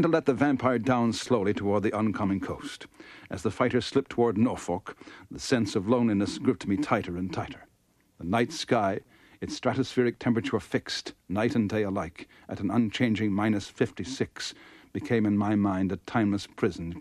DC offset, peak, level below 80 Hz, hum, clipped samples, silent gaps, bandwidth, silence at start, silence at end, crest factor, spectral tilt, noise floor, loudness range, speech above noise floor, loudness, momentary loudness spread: under 0.1%; -10 dBFS; -58 dBFS; none; under 0.1%; none; 12.5 kHz; 0 s; 0 s; 18 dB; -6 dB/octave; -67 dBFS; 2 LU; 39 dB; -28 LUFS; 13 LU